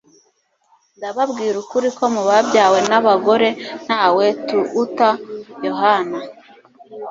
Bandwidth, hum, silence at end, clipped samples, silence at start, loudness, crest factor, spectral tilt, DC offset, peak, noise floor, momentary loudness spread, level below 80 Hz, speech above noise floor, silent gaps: 7.8 kHz; none; 0 s; under 0.1%; 1 s; -17 LUFS; 16 dB; -4 dB/octave; under 0.1%; 0 dBFS; -62 dBFS; 14 LU; -66 dBFS; 46 dB; none